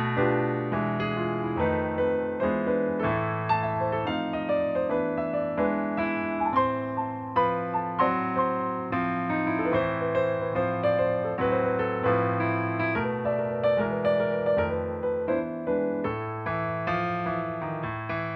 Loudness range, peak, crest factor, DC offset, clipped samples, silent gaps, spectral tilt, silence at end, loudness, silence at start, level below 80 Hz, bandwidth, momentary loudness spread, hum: 2 LU; -12 dBFS; 16 dB; under 0.1%; under 0.1%; none; -9.5 dB/octave; 0 s; -27 LUFS; 0 s; -54 dBFS; 5.6 kHz; 4 LU; none